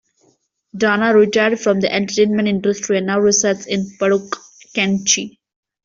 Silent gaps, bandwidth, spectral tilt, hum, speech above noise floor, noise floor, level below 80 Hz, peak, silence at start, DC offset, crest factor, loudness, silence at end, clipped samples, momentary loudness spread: none; 7.6 kHz; -3.5 dB/octave; none; 44 dB; -60 dBFS; -58 dBFS; -2 dBFS; 0.75 s; under 0.1%; 16 dB; -16 LUFS; 0.55 s; under 0.1%; 10 LU